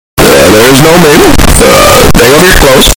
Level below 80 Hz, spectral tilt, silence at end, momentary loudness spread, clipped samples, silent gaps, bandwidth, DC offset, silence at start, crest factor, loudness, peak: -12 dBFS; -3.5 dB/octave; 0.05 s; 2 LU; 20%; none; over 20 kHz; under 0.1%; 0.15 s; 2 dB; -2 LUFS; 0 dBFS